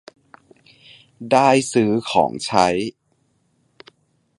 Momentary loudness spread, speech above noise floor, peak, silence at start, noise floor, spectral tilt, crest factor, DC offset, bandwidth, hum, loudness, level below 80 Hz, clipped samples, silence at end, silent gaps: 11 LU; 48 dB; 0 dBFS; 1.2 s; -65 dBFS; -4.5 dB/octave; 20 dB; under 0.1%; 11.5 kHz; none; -18 LUFS; -56 dBFS; under 0.1%; 1.5 s; none